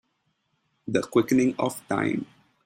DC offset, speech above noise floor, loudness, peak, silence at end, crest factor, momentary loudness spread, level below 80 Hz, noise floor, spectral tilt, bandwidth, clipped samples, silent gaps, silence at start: under 0.1%; 49 dB; -25 LUFS; -8 dBFS; 0.4 s; 20 dB; 13 LU; -66 dBFS; -74 dBFS; -6 dB/octave; 16 kHz; under 0.1%; none; 0.85 s